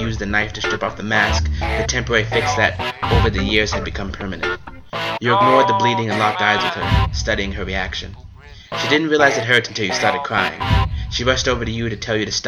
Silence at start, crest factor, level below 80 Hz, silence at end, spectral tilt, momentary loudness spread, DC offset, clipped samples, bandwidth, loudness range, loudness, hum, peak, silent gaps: 0 s; 18 dB; -30 dBFS; 0 s; -4.5 dB/octave; 9 LU; under 0.1%; under 0.1%; 13.5 kHz; 2 LU; -18 LUFS; none; 0 dBFS; none